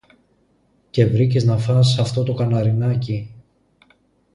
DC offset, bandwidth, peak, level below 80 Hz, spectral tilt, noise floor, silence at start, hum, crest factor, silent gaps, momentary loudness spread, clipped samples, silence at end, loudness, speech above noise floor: under 0.1%; 11 kHz; -2 dBFS; -50 dBFS; -7 dB/octave; -61 dBFS; 0.95 s; none; 16 dB; none; 10 LU; under 0.1%; 1 s; -19 LUFS; 44 dB